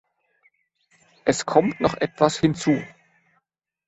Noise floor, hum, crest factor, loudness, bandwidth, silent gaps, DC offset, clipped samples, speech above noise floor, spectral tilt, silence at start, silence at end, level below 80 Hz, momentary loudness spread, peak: -74 dBFS; none; 22 dB; -22 LUFS; 8.2 kHz; none; under 0.1%; under 0.1%; 53 dB; -5 dB/octave; 1.25 s; 1 s; -56 dBFS; 6 LU; -2 dBFS